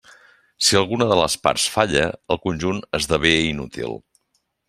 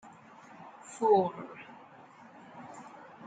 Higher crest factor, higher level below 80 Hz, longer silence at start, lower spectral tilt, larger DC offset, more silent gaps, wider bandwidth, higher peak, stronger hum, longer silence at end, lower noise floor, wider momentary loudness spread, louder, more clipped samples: about the same, 20 dB vs 22 dB; first, -46 dBFS vs -82 dBFS; about the same, 0.6 s vs 0.6 s; second, -3.5 dB/octave vs -6 dB/octave; neither; neither; first, 15.5 kHz vs 9.2 kHz; first, -2 dBFS vs -14 dBFS; neither; first, 0.7 s vs 0 s; first, -70 dBFS vs -54 dBFS; second, 12 LU vs 27 LU; first, -20 LUFS vs -28 LUFS; neither